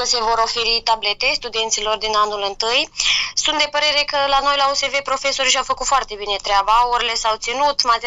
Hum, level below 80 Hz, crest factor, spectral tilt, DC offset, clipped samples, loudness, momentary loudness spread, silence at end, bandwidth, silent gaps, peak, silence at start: none; -42 dBFS; 18 dB; 0.5 dB/octave; under 0.1%; under 0.1%; -17 LUFS; 4 LU; 0 s; 12.5 kHz; none; 0 dBFS; 0 s